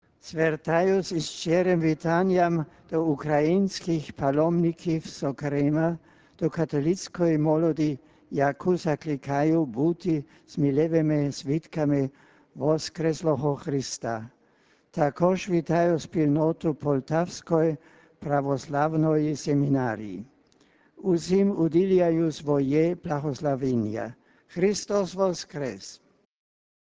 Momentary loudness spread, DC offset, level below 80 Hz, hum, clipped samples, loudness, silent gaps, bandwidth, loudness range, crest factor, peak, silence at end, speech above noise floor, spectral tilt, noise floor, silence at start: 9 LU; under 0.1%; -58 dBFS; none; under 0.1%; -26 LUFS; none; 8 kHz; 3 LU; 18 dB; -8 dBFS; 0.9 s; 38 dB; -7 dB/octave; -63 dBFS; 0.25 s